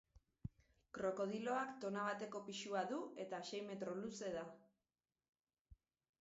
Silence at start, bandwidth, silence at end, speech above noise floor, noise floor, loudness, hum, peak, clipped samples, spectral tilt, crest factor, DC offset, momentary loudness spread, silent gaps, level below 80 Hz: 0.15 s; 7.6 kHz; 0.45 s; over 45 dB; under -90 dBFS; -46 LUFS; none; -28 dBFS; under 0.1%; -3.5 dB/octave; 20 dB; under 0.1%; 14 LU; 5.29-5.33 s, 5.61-5.65 s; -74 dBFS